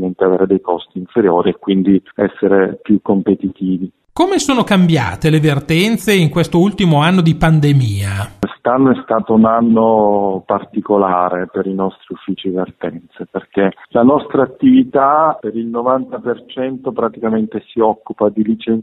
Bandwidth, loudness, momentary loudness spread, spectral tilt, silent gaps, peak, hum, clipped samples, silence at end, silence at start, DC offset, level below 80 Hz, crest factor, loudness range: 13.5 kHz; -14 LUFS; 10 LU; -7 dB/octave; none; 0 dBFS; none; under 0.1%; 0 s; 0 s; under 0.1%; -42 dBFS; 14 dB; 5 LU